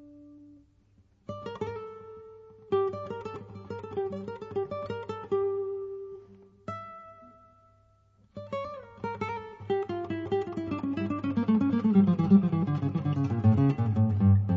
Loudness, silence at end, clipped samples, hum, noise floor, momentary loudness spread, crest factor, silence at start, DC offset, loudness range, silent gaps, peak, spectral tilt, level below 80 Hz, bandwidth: -29 LUFS; 0 s; under 0.1%; none; -63 dBFS; 21 LU; 20 dB; 0 s; under 0.1%; 15 LU; none; -10 dBFS; -10 dB/octave; -62 dBFS; 6.6 kHz